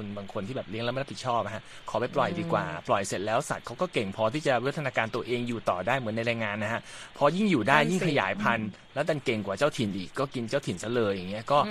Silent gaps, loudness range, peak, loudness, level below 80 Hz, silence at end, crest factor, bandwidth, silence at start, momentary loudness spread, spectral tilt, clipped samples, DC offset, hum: none; 3 LU; -4 dBFS; -29 LUFS; -60 dBFS; 0 s; 24 dB; 13.5 kHz; 0 s; 9 LU; -5.5 dB/octave; under 0.1%; under 0.1%; none